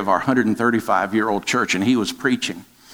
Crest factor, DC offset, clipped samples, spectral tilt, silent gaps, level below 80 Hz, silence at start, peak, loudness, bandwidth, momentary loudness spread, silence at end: 16 dB; under 0.1%; under 0.1%; -4.5 dB/octave; none; -62 dBFS; 0 s; -4 dBFS; -20 LUFS; 19 kHz; 4 LU; 0 s